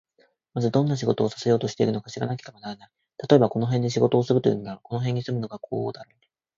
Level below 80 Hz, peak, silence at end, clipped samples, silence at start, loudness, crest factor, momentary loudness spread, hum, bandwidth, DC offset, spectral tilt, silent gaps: -62 dBFS; -2 dBFS; 0.55 s; under 0.1%; 0.55 s; -24 LUFS; 22 dB; 16 LU; none; 7.6 kHz; under 0.1%; -7 dB/octave; none